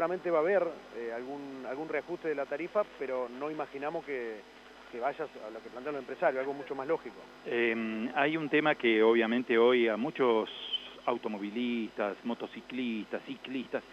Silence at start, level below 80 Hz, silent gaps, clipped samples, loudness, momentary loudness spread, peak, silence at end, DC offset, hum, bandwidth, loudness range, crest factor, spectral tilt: 0 s; -74 dBFS; none; under 0.1%; -32 LUFS; 15 LU; -12 dBFS; 0 s; under 0.1%; none; 8.6 kHz; 9 LU; 20 dB; -6 dB/octave